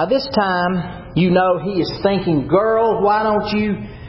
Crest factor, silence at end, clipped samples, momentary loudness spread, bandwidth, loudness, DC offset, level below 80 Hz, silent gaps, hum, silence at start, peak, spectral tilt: 14 dB; 0 s; under 0.1%; 6 LU; 5.8 kHz; -17 LUFS; under 0.1%; -42 dBFS; none; none; 0 s; -4 dBFS; -10.5 dB/octave